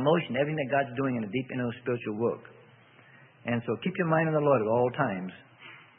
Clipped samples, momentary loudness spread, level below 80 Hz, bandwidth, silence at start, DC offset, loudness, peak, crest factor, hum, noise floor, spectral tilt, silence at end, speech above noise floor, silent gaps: under 0.1%; 15 LU; -70 dBFS; 3.7 kHz; 0 s; under 0.1%; -29 LUFS; -10 dBFS; 18 dB; none; -56 dBFS; -11 dB/octave; 0.2 s; 28 dB; none